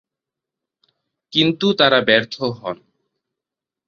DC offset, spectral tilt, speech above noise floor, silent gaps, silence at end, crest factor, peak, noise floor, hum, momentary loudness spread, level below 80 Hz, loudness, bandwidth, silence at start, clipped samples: under 0.1%; -5.5 dB/octave; 69 dB; none; 1.15 s; 20 dB; -2 dBFS; -86 dBFS; none; 16 LU; -60 dBFS; -16 LUFS; 7.2 kHz; 1.35 s; under 0.1%